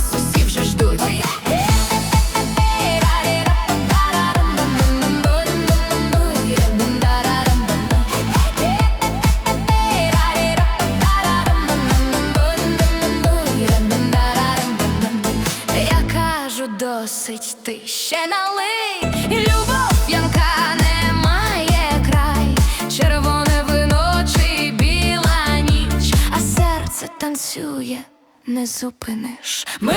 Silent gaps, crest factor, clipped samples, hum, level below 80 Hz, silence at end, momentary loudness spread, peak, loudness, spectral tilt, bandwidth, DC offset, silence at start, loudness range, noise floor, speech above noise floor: none; 14 dB; under 0.1%; none; -22 dBFS; 0 s; 7 LU; -4 dBFS; -17 LUFS; -4.5 dB/octave; over 20 kHz; under 0.1%; 0 s; 4 LU; -40 dBFS; 17 dB